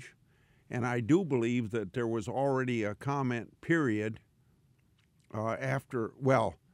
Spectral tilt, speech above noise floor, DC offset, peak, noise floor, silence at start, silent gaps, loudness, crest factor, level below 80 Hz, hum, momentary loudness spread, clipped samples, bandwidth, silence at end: -7 dB/octave; 37 dB; under 0.1%; -14 dBFS; -68 dBFS; 0 s; none; -32 LUFS; 18 dB; -68 dBFS; none; 9 LU; under 0.1%; 13 kHz; 0.2 s